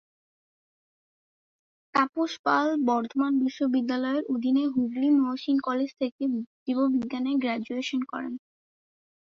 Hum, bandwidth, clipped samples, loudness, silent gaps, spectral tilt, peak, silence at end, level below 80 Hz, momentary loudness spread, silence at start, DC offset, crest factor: none; 7.2 kHz; under 0.1%; -27 LUFS; 2.39-2.44 s, 6.12-6.19 s, 6.47-6.66 s; -5 dB/octave; -10 dBFS; 0.85 s; -74 dBFS; 7 LU; 1.95 s; under 0.1%; 18 dB